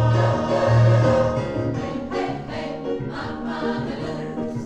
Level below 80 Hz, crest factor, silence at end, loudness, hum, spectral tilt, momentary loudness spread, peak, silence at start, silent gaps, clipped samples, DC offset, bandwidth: -42 dBFS; 14 dB; 0 s; -22 LUFS; none; -8 dB/octave; 12 LU; -8 dBFS; 0 s; none; under 0.1%; under 0.1%; 8.2 kHz